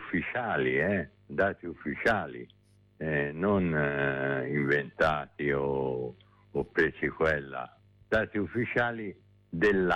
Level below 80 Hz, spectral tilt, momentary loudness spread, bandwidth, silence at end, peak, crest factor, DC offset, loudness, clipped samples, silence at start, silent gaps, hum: -54 dBFS; -7.5 dB/octave; 12 LU; 10 kHz; 0 s; -16 dBFS; 14 dB; under 0.1%; -30 LUFS; under 0.1%; 0 s; none; none